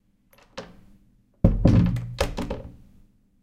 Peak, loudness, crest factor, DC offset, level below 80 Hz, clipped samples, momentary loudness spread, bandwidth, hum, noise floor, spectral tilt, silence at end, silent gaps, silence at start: -2 dBFS; -23 LUFS; 24 dB; under 0.1%; -32 dBFS; under 0.1%; 23 LU; 14.5 kHz; none; -59 dBFS; -7.5 dB/octave; 0.7 s; none; 0.55 s